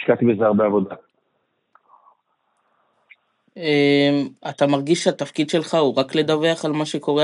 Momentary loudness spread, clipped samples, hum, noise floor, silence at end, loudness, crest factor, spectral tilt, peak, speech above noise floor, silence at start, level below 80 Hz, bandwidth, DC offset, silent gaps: 7 LU; under 0.1%; none; -70 dBFS; 0 s; -19 LUFS; 18 dB; -5.5 dB/octave; -2 dBFS; 51 dB; 0 s; -76 dBFS; 11 kHz; under 0.1%; none